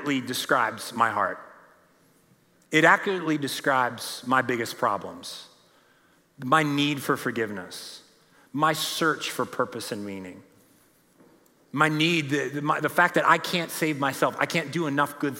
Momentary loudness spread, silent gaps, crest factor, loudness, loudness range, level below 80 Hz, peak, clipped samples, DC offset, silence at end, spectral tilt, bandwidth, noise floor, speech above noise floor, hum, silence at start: 16 LU; none; 22 dB; -25 LUFS; 5 LU; -78 dBFS; -4 dBFS; under 0.1%; under 0.1%; 0 s; -4 dB/octave; 16.5 kHz; -62 dBFS; 36 dB; none; 0 s